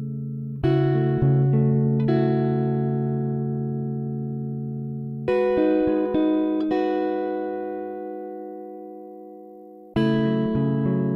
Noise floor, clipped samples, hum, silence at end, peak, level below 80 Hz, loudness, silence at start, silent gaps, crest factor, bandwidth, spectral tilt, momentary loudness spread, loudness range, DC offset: -44 dBFS; under 0.1%; none; 0 s; -10 dBFS; -50 dBFS; -23 LUFS; 0 s; none; 14 dB; 4.7 kHz; -10.5 dB/octave; 16 LU; 7 LU; under 0.1%